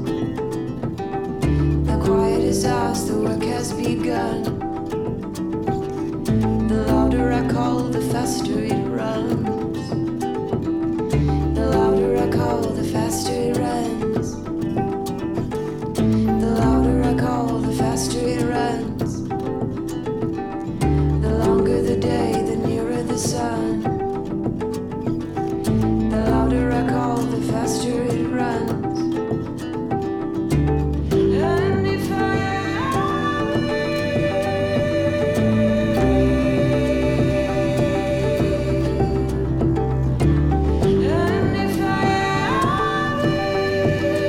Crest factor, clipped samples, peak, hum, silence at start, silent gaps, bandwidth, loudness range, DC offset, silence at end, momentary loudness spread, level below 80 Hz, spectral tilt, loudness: 12 dB; under 0.1%; -8 dBFS; none; 0 s; none; 17 kHz; 4 LU; under 0.1%; 0 s; 7 LU; -32 dBFS; -6.5 dB/octave; -21 LUFS